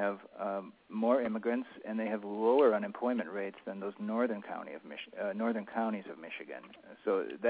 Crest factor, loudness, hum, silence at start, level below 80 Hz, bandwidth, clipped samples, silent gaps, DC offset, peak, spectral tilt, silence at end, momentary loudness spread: 18 dB; -34 LUFS; none; 0 s; -82 dBFS; 4 kHz; under 0.1%; none; under 0.1%; -16 dBFS; -4.5 dB/octave; 0 s; 15 LU